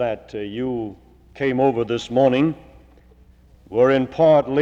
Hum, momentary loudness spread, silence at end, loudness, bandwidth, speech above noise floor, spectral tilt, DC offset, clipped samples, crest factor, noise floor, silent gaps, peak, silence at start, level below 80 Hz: none; 14 LU; 0 s; -20 LUFS; 8 kHz; 32 dB; -7 dB/octave; under 0.1%; under 0.1%; 16 dB; -50 dBFS; none; -4 dBFS; 0 s; -50 dBFS